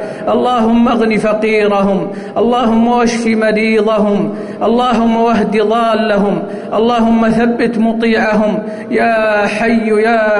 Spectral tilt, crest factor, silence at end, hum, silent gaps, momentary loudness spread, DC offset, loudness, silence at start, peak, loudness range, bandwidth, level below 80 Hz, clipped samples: -6 dB/octave; 8 dB; 0 s; none; none; 5 LU; under 0.1%; -12 LUFS; 0 s; -4 dBFS; 1 LU; 11 kHz; -40 dBFS; under 0.1%